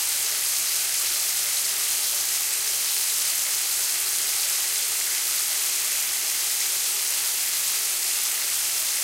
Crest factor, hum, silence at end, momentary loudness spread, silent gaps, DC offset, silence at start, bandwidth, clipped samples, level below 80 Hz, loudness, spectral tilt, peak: 16 dB; none; 0 s; 1 LU; none; under 0.1%; 0 s; 17 kHz; under 0.1%; -72 dBFS; -21 LUFS; 3.5 dB/octave; -10 dBFS